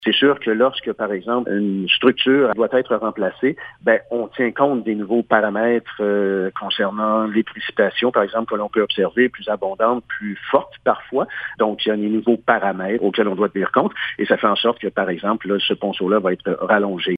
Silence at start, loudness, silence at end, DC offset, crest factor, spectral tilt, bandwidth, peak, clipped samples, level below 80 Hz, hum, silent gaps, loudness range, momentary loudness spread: 0 s; -19 LUFS; 0 s; under 0.1%; 18 dB; -8 dB/octave; 5 kHz; 0 dBFS; under 0.1%; -62 dBFS; none; none; 2 LU; 7 LU